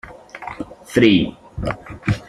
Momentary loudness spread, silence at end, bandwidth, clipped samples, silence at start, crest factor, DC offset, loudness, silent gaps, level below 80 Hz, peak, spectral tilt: 19 LU; 0.05 s; 14 kHz; under 0.1%; 0.05 s; 18 dB; under 0.1%; -19 LUFS; none; -40 dBFS; -2 dBFS; -6.5 dB/octave